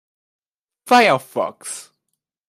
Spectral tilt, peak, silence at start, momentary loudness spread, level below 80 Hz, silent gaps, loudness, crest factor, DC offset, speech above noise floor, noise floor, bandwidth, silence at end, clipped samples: -3 dB/octave; -2 dBFS; 0.85 s; 18 LU; -74 dBFS; none; -17 LUFS; 20 dB; under 0.1%; 60 dB; -78 dBFS; 15.5 kHz; 0.65 s; under 0.1%